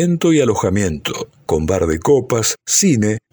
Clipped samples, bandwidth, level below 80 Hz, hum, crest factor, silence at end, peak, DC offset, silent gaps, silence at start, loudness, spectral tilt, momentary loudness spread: under 0.1%; over 20 kHz; -38 dBFS; none; 14 dB; 0.15 s; -2 dBFS; under 0.1%; none; 0 s; -16 LUFS; -4.5 dB/octave; 8 LU